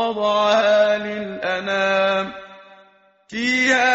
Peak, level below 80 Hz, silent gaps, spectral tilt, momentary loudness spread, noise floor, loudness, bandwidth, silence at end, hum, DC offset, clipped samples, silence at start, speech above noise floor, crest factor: -4 dBFS; -60 dBFS; none; -1 dB/octave; 12 LU; -53 dBFS; -19 LUFS; 8 kHz; 0 s; none; under 0.1%; under 0.1%; 0 s; 35 dB; 14 dB